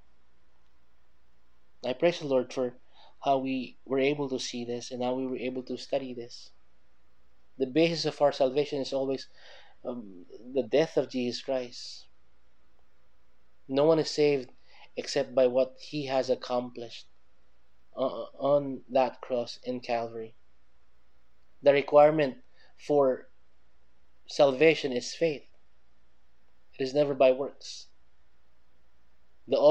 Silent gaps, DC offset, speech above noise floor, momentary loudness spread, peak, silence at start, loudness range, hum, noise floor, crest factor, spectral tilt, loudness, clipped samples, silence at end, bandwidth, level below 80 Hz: none; 0.4%; 42 dB; 18 LU; -8 dBFS; 1.85 s; 6 LU; none; -70 dBFS; 22 dB; -5 dB/octave; -28 LUFS; under 0.1%; 0 s; 9.2 kHz; -72 dBFS